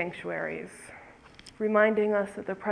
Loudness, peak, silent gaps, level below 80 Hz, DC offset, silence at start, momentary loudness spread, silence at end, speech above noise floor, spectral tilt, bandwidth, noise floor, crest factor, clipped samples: -28 LUFS; -10 dBFS; none; -66 dBFS; under 0.1%; 0 s; 22 LU; 0 s; 24 dB; -6 dB/octave; 11 kHz; -52 dBFS; 20 dB; under 0.1%